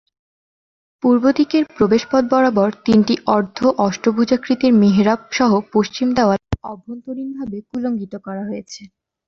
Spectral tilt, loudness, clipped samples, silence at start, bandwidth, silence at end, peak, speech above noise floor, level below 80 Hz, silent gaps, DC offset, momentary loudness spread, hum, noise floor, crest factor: -6.5 dB/octave; -17 LUFS; under 0.1%; 1.05 s; 7 kHz; 0.4 s; -2 dBFS; over 73 dB; -46 dBFS; none; under 0.1%; 14 LU; none; under -90 dBFS; 16 dB